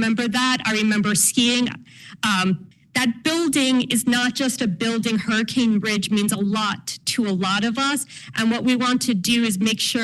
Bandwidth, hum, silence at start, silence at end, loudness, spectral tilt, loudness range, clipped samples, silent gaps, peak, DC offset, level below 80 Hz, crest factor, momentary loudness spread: 13 kHz; none; 0 s; 0 s; -20 LUFS; -3 dB/octave; 1 LU; under 0.1%; none; -6 dBFS; under 0.1%; -58 dBFS; 16 dB; 6 LU